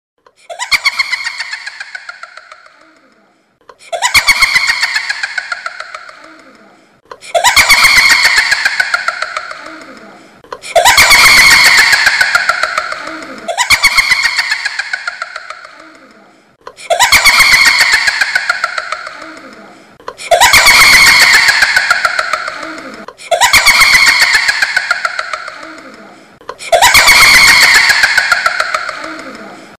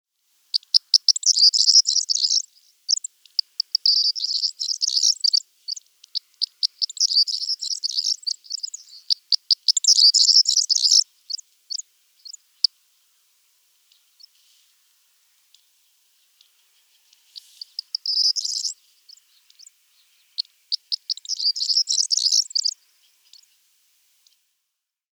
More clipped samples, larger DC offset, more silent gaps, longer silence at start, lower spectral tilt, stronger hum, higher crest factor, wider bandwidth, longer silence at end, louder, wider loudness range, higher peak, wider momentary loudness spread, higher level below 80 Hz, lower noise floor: first, 0.1% vs under 0.1%; neither; neither; about the same, 0.5 s vs 0.55 s; first, 1 dB/octave vs 9 dB/octave; neither; second, 10 dB vs 22 dB; about the same, over 20 kHz vs over 20 kHz; second, 0.15 s vs 2.5 s; first, -6 LUFS vs -18 LUFS; second, 8 LU vs 13 LU; about the same, 0 dBFS vs -2 dBFS; first, 22 LU vs 18 LU; first, -38 dBFS vs under -90 dBFS; second, -52 dBFS vs -80 dBFS